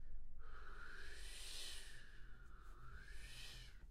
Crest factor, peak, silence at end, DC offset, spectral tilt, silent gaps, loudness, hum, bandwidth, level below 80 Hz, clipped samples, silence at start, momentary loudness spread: 12 dB; -38 dBFS; 0 s; under 0.1%; -1.5 dB/octave; none; -56 LUFS; none; 14 kHz; -54 dBFS; under 0.1%; 0 s; 12 LU